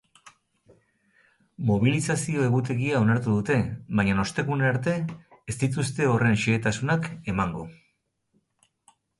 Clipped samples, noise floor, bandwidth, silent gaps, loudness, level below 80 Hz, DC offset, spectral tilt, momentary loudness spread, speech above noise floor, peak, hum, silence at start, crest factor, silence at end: under 0.1%; -73 dBFS; 11.5 kHz; none; -25 LUFS; -52 dBFS; under 0.1%; -6 dB/octave; 8 LU; 49 dB; -8 dBFS; none; 0.25 s; 18 dB; 1.45 s